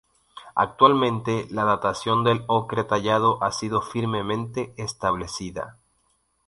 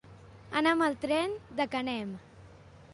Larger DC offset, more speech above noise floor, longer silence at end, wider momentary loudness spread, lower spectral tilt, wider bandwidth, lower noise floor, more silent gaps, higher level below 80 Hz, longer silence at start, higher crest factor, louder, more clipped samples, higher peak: neither; first, 45 dB vs 23 dB; first, 0.75 s vs 0 s; about the same, 13 LU vs 11 LU; about the same, -5.5 dB/octave vs -5 dB/octave; about the same, 11.5 kHz vs 11.5 kHz; first, -68 dBFS vs -53 dBFS; neither; first, -54 dBFS vs -62 dBFS; first, 0.35 s vs 0.05 s; about the same, 22 dB vs 20 dB; first, -23 LUFS vs -31 LUFS; neither; first, -2 dBFS vs -14 dBFS